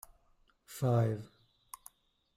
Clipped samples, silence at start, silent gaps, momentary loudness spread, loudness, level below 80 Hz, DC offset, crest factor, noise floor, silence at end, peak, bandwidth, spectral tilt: under 0.1%; 0.7 s; none; 22 LU; -33 LUFS; -68 dBFS; under 0.1%; 18 dB; -70 dBFS; 1.1 s; -20 dBFS; 16 kHz; -7.5 dB/octave